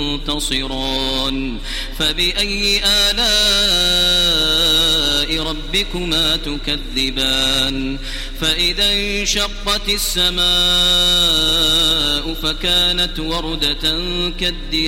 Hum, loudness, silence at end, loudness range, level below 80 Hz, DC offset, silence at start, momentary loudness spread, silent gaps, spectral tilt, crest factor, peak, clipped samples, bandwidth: none; -15 LUFS; 0 s; 4 LU; -26 dBFS; under 0.1%; 0 s; 9 LU; none; -2 dB/octave; 14 dB; -2 dBFS; under 0.1%; 16.5 kHz